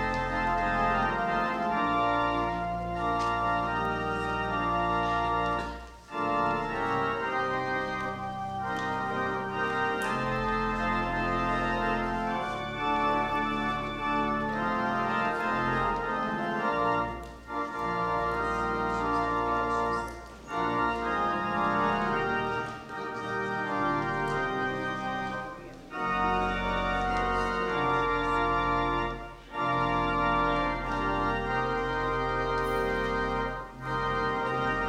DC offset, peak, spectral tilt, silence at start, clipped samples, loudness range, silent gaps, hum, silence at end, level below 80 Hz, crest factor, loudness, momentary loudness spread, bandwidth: under 0.1%; -14 dBFS; -6 dB/octave; 0 s; under 0.1%; 2 LU; none; none; 0 s; -44 dBFS; 14 dB; -29 LUFS; 7 LU; 16 kHz